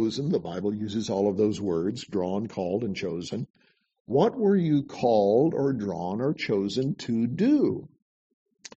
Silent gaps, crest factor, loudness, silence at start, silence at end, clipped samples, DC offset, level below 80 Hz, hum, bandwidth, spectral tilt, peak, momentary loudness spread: 3.50-3.54 s, 4.00-4.05 s; 18 dB; -26 LUFS; 0 s; 0.9 s; under 0.1%; under 0.1%; -64 dBFS; none; 8.2 kHz; -7 dB/octave; -8 dBFS; 8 LU